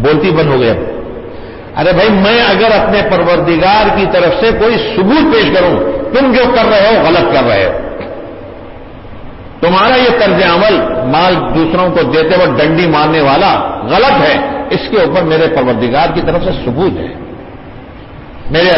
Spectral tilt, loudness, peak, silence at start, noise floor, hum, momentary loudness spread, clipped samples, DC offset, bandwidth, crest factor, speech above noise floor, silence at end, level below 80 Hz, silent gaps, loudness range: -9 dB/octave; -9 LUFS; 0 dBFS; 0 s; -29 dBFS; none; 16 LU; under 0.1%; under 0.1%; 5.8 kHz; 10 dB; 20 dB; 0 s; -30 dBFS; none; 4 LU